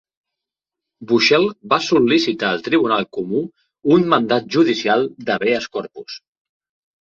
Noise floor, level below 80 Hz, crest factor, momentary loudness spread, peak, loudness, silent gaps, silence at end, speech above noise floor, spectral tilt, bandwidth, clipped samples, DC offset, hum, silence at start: -85 dBFS; -60 dBFS; 18 dB; 14 LU; -2 dBFS; -17 LUFS; none; 0.85 s; 68 dB; -5 dB/octave; 7.4 kHz; under 0.1%; under 0.1%; none; 1 s